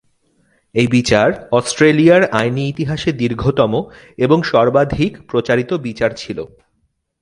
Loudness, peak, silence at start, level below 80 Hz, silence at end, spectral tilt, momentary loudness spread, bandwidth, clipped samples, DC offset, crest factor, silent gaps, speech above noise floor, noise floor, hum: -15 LUFS; 0 dBFS; 0.75 s; -42 dBFS; 0.75 s; -6 dB/octave; 11 LU; 11.5 kHz; under 0.1%; under 0.1%; 16 dB; none; 51 dB; -66 dBFS; none